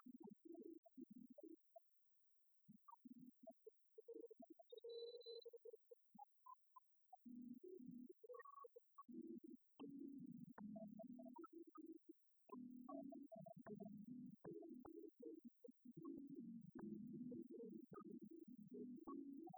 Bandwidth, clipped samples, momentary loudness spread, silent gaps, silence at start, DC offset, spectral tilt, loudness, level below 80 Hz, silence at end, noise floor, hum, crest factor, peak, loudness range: over 20 kHz; under 0.1%; 9 LU; 0.78-0.83 s; 0 s; under 0.1%; -8 dB/octave; -60 LUFS; under -90 dBFS; 0 s; -79 dBFS; none; 16 dB; -44 dBFS; 7 LU